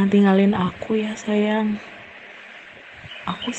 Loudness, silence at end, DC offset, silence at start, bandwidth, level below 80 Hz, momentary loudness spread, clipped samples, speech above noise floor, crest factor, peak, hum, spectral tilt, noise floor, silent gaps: -21 LUFS; 0 s; under 0.1%; 0 s; 8.2 kHz; -58 dBFS; 23 LU; under 0.1%; 22 dB; 16 dB; -6 dBFS; none; -6.5 dB/octave; -42 dBFS; none